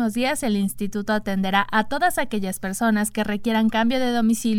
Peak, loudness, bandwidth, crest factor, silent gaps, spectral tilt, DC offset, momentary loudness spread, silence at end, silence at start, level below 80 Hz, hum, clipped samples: -4 dBFS; -22 LUFS; 17 kHz; 18 dB; none; -4.5 dB/octave; under 0.1%; 5 LU; 0 s; 0 s; -48 dBFS; none; under 0.1%